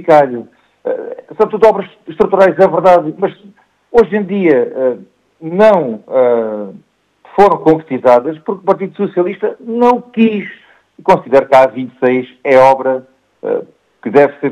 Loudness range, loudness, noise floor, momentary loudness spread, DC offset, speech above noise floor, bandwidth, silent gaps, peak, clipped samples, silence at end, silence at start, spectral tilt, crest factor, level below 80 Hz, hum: 2 LU; -12 LUFS; -44 dBFS; 13 LU; under 0.1%; 33 dB; 9.6 kHz; none; 0 dBFS; 0.4%; 0 s; 0 s; -7.5 dB/octave; 12 dB; -50 dBFS; none